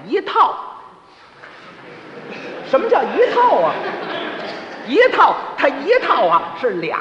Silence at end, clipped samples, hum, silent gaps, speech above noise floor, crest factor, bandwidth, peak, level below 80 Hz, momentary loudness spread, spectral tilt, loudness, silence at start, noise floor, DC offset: 0 s; under 0.1%; none; none; 29 dB; 16 dB; 7.8 kHz; 0 dBFS; -64 dBFS; 20 LU; -5 dB/octave; -16 LUFS; 0 s; -44 dBFS; under 0.1%